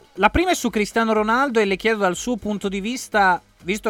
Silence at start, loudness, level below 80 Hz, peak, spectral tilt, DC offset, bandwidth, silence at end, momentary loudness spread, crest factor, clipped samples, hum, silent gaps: 0.15 s; -20 LUFS; -40 dBFS; 0 dBFS; -4 dB/octave; under 0.1%; 18 kHz; 0 s; 7 LU; 20 dB; under 0.1%; none; none